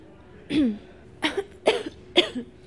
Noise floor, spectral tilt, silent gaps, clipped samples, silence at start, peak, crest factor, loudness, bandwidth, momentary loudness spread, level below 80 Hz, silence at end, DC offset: -48 dBFS; -4 dB/octave; none; under 0.1%; 0.35 s; -2 dBFS; 26 dB; -25 LUFS; 11.5 kHz; 8 LU; -56 dBFS; 0.15 s; 0.1%